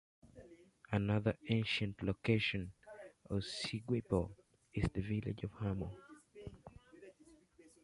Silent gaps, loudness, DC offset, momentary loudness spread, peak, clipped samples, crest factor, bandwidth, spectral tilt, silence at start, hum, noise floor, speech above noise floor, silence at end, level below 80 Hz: none; -39 LUFS; under 0.1%; 24 LU; -18 dBFS; under 0.1%; 22 dB; 11.5 kHz; -6.5 dB/octave; 0.25 s; none; -65 dBFS; 28 dB; 0.5 s; -56 dBFS